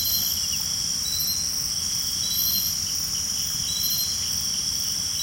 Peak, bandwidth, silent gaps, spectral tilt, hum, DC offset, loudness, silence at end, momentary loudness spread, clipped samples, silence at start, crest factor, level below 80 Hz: -12 dBFS; 16.5 kHz; none; 0 dB/octave; none; under 0.1%; -22 LUFS; 0 s; 3 LU; under 0.1%; 0 s; 14 dB; -50 dBFS